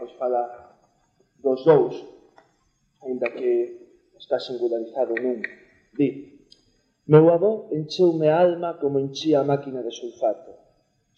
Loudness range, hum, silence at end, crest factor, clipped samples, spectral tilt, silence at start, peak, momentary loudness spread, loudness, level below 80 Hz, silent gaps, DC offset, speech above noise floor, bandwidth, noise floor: 8 LU; none; 0.65 s; 22 dB; under 0.1%; -7.5 dB/octave; 0 s; -2 dBFS; 15 LU; -22 LUFS; -72 dBFS; none; under 0.1%; 46 dB; 7 kHz; -67 dBFS